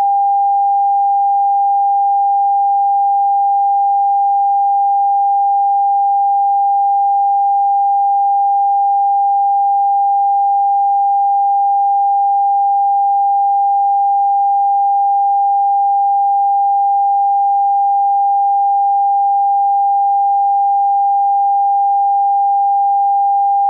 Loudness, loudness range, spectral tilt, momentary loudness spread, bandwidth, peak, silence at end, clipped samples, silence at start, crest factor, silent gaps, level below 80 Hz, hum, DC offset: -13 LUFS; 0 LU; -3 dB/octave; 0 LU; 1 kHz; -10 dBFS; 0 s; under 0.1%; 0 s; 4 dB; none; under -90 dBFS; none; under 0.1%